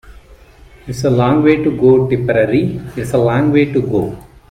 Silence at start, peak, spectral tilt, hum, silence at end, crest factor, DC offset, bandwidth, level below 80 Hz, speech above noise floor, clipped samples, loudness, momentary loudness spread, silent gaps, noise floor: 0.05 s; 0 dBFS; -8 dB/octave; none; 0.3 s; 14 dB; under 0.1%; 14.5 kHz; -40 dBFS; 28 dB; under 0.1%; -14 LUFS; 11 LU; none; -42 dBFS